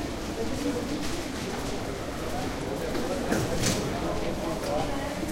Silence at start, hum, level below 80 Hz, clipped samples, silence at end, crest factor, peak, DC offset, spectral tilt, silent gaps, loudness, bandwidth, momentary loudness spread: 0 s; none; -42 dBFS; under 0.1%; 0 s; 18 dB; -12 dBFS; under 0.1%; -4.5 dB/octave; none; -30 LUFS; 16 kHz; 6 LU